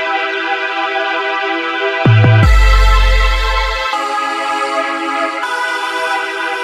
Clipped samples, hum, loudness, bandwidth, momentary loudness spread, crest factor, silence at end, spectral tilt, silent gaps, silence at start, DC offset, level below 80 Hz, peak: under 0.1%; none; -14 LUFS; 12.5 kHz; 7 LU; 12 dB; 0 s; -5 dB/octave; none; 0 s; under 0.1%; -18 dBFS; 0 dBFS